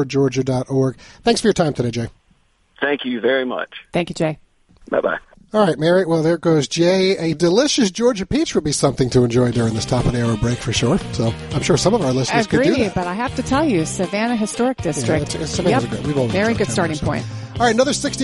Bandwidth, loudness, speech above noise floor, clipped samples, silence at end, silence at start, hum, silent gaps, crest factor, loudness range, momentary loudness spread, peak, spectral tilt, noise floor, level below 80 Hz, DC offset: 11.5 kHz; -18 LUFS; 40 dB; under 0.1%; 0 s; 0 s; none; none; 16 dB; 4 LU; 7 LU; -2 dBFS; -5 dB/octave; -58 dBFS; -40 dBFS; under 0.1%